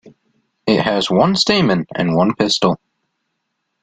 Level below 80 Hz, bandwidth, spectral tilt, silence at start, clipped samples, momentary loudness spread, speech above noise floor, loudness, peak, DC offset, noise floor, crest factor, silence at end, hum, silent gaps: -52 dBFS; 9.4 kHz; -5 dB/octave; 0.05 s; under 0.1%; 5 LU; 58 dB; -16 LUFS; 0 dBFS; under 0.1%; -73 dBFS; 18 dB; 1.05 s; none; none